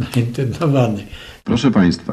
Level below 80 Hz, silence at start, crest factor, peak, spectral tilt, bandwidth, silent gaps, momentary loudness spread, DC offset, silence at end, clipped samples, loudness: -42 dBFS; 0 s; 14 dB; -2 dBFS; -7 dB/octave; 14 kHz; none; 14 LU; under 0.1%; 0 s; under 0.1%; -17 LUFS